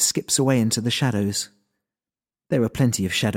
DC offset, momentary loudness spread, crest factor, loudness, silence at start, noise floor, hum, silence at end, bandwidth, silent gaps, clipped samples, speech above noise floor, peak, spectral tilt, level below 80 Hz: under 0.1%; 7 LU; 16 dB; -22 LUFS; 0 s; under -90 dBFS; none; 0 s; 17 kHz; none; under 0.1%; over 69 dB; -6 dBFS; -4 dB/octave; -54 dBFS